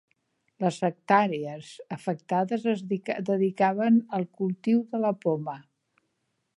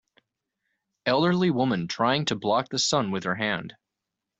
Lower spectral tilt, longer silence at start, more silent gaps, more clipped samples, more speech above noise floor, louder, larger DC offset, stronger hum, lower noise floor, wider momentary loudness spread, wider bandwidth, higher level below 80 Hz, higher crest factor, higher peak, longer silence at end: first, -7.5 dB/octave vs -4.5 dB/octave; second, 0.6 s vs 1.05 s; neither; neither; second, 51 dB vs 61 dB; about the same, -27 LUFS vs -25 LUFS; neither; neither; second, -77 dBFS vs -85 dBFS; first, 11 LU vs 6 LU; first, 11 kHz vs 8.2 kHz; second, -80 dBFS vs -64 dBFS; about the same, 20 dB vs 18 dB; about the same, -6 dBFS vs -8 dBFS; first, 0.95 s vs 0.7 s